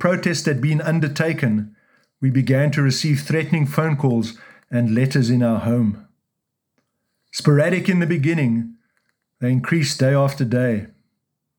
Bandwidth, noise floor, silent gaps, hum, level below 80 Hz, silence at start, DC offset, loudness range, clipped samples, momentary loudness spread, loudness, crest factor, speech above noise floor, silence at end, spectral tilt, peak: 19.5 kHz; -78 dBFS; none; none; -62 dBFS; 0 s; under 0.1%; 2 LU; under 0.1%; 7 LU; -19 LUFS; 18 dB; 60 dB; 0.7 s; -6.5 dB/octave; -2 dBFS